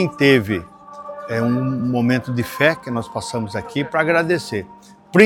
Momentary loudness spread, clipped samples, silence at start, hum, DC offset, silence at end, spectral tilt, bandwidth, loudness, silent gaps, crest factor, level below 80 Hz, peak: 14 LU; under 0.1%; 0 s; none; under 0.1%; 0 s; -6 dB/octave; 18 kHz; -20 LUFS; none; 20 dB; -54 dBFS; 0 dBFS